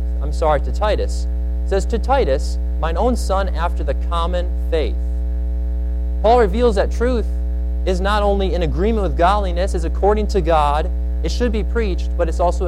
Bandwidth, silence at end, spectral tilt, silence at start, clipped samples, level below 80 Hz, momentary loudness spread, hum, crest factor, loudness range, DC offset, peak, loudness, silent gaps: 10.5 kHz; 0 s; -6.5 dB/octave; 0 s; under 0.1%; -20 dBFS; 7 LU; none; 14 dB; 3 LU; under 0.1%; -4 dBFS; -19 LUFS; none